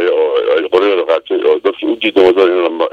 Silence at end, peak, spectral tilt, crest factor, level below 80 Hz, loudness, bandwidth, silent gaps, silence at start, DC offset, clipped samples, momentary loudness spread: 0.05 s; 0 dBFS; -5 dB/octave; 12 dB; -56 dBFS; -12 LUFS; 6.6 kHz; none; 0 s; under 0.1%; under 0.1%; 5 LU